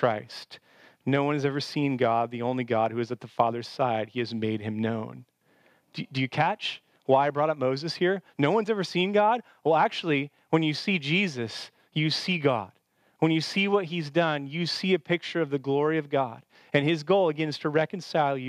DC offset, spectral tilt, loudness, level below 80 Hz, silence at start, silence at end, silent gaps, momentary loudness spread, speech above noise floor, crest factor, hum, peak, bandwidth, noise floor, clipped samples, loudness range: under 0.1%; -6 dB/octave; -27 LUFS; -80 dBFS; 0 s; 0 s; none; 10 LU; 37 dB; 20 dB; none; -6 dBFS; 13 kHz; -64 dBFS; under 0.1%; 4 LU